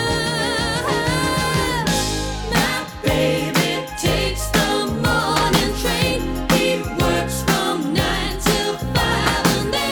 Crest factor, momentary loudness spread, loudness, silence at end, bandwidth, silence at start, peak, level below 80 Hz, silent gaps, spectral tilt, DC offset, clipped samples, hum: 18 dB; 3 LU; -19 LUFS; 0 s; over 20 kHz; 0 s; -2 dBFS; -32 dBFS; none; -4 dB/octave; under 0.1%; under 0.1%; none